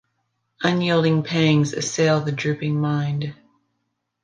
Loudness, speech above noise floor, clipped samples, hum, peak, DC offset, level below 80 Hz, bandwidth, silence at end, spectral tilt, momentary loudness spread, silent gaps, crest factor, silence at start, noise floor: -21 LUFS; 55 dB; under 0.1%; none; -4 dBFS; under 0.1%; -62 dBFS; 9.4 kHz; 0.9 s; -5.5 dB/octave; 7 LU; none; 18 dB; 0.6 s; -75 dBFS